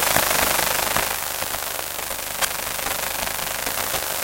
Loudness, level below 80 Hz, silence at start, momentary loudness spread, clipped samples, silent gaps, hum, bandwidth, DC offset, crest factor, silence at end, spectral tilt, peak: -22 LUFS; -46 dBFS; 0 s; 8 LU; under 0.1%; none; 50 Hz at -50 dBFS; 17.5 kHz; under 0.1%; 24 dB; 0 s; -0.5 dB/octave; 0 dBFS